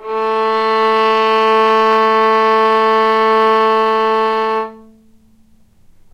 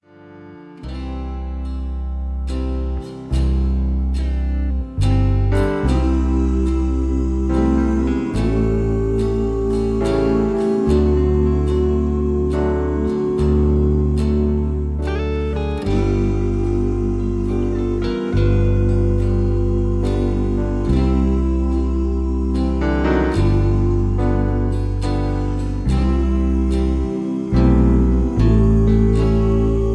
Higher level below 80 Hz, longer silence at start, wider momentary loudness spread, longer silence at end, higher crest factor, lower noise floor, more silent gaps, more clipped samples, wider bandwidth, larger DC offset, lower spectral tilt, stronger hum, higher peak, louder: second, -56 dBFS vs -20 dBFS; second, 0 s vs 0.25 s; about the same, 5 LU vs 7 LU; first, 1.35 s vs 0 s; about the same, 12 dB vs 14 dB; first, -48 dBFS vs -41 dBFS; neither; neither; about the same, 9.4 kHz vs 9.8 kHz; neither; second, -4.5 dB/octave vs -9 dB/octave; neither; about the same, -2 dBFS vs -2 dBFS; first, -13 LUFS vs -19 LUFS